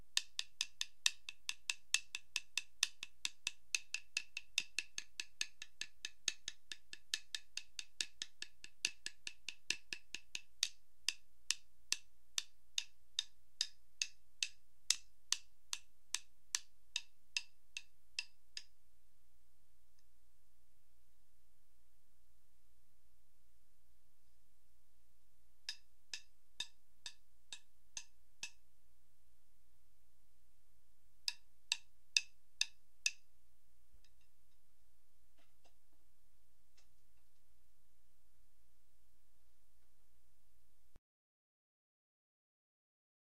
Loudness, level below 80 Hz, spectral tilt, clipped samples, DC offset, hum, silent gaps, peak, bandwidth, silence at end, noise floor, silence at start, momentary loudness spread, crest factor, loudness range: -43 LUFS; -80 dBFS; 2.5 dB/octave; under 0.1%; 0.3%; 60 Hz at -95 dBFS; none; -10 dBFS; 15.5 kHz; 2.4 s; -78 dBFS; 0.15 s; 14 LU; 38 dB; 14 LU